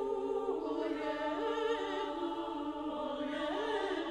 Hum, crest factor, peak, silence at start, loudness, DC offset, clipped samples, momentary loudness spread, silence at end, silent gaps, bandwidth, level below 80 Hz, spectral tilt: none; 12 dB; -24 dBFS; 0 s; -37 LUFS; under 0.1%; under 0.1%; 4 LU; 0 s; none; 11 kHz; -64 dBFS; -4.5 dB/octave